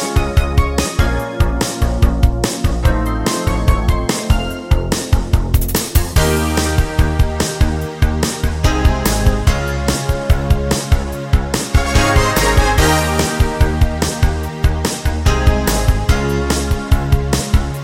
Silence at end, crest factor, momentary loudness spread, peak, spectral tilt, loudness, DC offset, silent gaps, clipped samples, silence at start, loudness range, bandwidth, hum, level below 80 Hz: 0 s; 14 dB; 5 LU; 0 dBFS; -5 dB/octave; -16 LUFS; under 0.1%; none; under 0.1%; 0 s; 2 LU; 17 kHz; none; -18 dBFS